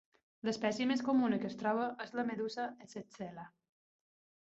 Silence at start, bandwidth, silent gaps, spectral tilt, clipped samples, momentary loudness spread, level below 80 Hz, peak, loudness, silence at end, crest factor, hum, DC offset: 0.45 s; 8 kHz; none; -4 dB/octave; under 0.1%; 17 LU; -80 dBFS; -20 dBFS; -36 LUFS; 1 s; 18 dB; none; under 0.1%